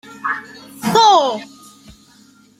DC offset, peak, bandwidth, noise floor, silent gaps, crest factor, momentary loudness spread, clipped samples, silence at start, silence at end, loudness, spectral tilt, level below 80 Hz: under 0.1%; -2 dBFS; 16 kHz; -49 dBFS; none; 16 dB; 17 LU; under 0.1%; 0.1 s; 1.15 s; -15 LUFS; -3 dB/octave; -58 dBFS